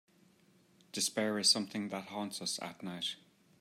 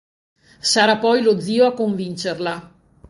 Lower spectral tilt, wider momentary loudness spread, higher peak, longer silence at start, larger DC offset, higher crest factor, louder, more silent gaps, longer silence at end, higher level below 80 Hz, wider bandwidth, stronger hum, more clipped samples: second, -2 dB/octave vs -3.5 dB/octave; first, 14 LU vs 11 LU; second, -14 dBFS vs 0 dBFS; first, 0.95 s vs 0.65 s; neither; first, 24 dB vs 18 dB; second, -34 LUFS vs -18 LUFS; neither; about the same, 0.45 s vs 0.45 s; second, -86 dBFS vs -60 dBFS; first, 16 kHz vs 11.5 kHz; neither; neither